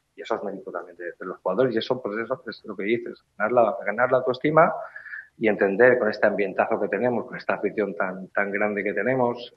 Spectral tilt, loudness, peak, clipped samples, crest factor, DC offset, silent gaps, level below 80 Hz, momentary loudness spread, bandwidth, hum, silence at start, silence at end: -7.5 dB/octave; -24 LUFS; -2 dBFS; under 0.1%; 22 dB; under 0.1%; none; -72 dBFS; 15 LU; 6.2 kHz; none; 0.2 s; 0.1 s